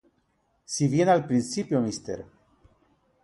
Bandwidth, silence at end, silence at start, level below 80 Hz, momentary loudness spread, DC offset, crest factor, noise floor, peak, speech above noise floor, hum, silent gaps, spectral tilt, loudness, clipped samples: 11.5 kHz; 1 s; 0.7 s; -62 dBFS; 14 LU; under 0.1%; 20 dB; -70 dBFS; -8 dBFS; 46 dB; none; none; -5.5 dB/octave; -25 LUFS; under 0.1%